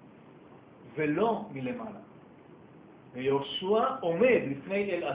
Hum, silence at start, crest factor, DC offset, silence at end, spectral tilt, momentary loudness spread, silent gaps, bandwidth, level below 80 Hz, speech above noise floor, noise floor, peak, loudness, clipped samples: none; 0 s; 18 dB; under 0.1%; 0 s; -9.5 dB/octave; 17 LU; none; 4 kHz; -68 dBFS; 24 dB; -53 dBFS; -12 dBFS; -29 LUFS; under 0.1%